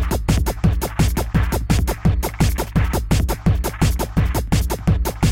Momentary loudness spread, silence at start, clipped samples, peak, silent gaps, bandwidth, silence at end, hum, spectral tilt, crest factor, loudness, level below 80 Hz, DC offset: 2 LU; 0 s; under 0.1%; -4 dBFS; none; 17 kHz; 0 s; none; -6 dB/octave; 14 dB; -20 LUFS; -22 dBFS; under 0.1%